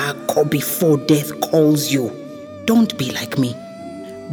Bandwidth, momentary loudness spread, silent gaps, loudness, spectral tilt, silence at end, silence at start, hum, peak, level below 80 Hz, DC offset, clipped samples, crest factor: over 20 kHz; 18 LU; none; -18 LUFS; -5 dB/octave; 0 s; 0 s; none; -2 dBFS; -60 dBFS; under 0.1%; under 0.1%; 16 dB